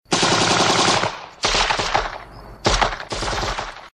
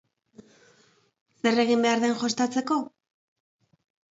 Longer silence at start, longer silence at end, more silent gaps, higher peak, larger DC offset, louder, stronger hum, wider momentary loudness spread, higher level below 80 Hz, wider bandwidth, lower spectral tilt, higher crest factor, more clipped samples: second, 0.1 s vs 1.45 s; second, 0.05 s vs 1.25 s; neither; first, -2 dBFS vs -10 dBFS; neither; first, -19 LUFS vs -25 LUFS; neither; first, 10 LU vs 7 LU; first, -34 dBFS vs -76 dBFS; first, 13 kHz vs 8 kHz; about the same, -2.5 dB/octave vs -3.5 dB/octave; about the same, 20 dB vs 18 dB; neither